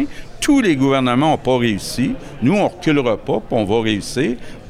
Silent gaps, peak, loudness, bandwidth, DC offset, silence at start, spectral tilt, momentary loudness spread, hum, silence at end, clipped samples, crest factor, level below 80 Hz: none; -4 dBFS; -17 LUFS; 15.5 kHz; under 0.1%; 0 s; -5.5 dB/octave; 6 LU; none; 0 s; under 0.1%; 12 dB; -38 dBFS